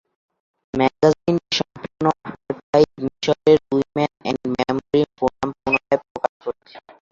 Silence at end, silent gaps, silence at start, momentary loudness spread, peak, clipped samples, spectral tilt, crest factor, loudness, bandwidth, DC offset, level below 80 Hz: 0.35 s; 2.63-2.73 s, 6.10-6.15 s, 6.29-6.40 s; 0.75 s; 13 LU; -2 dBFS; under 0.1%; -5.5 dB/octave; 18 dB; -21 LUFS; 7.6 kHz; under 0.1%; -54 dBFS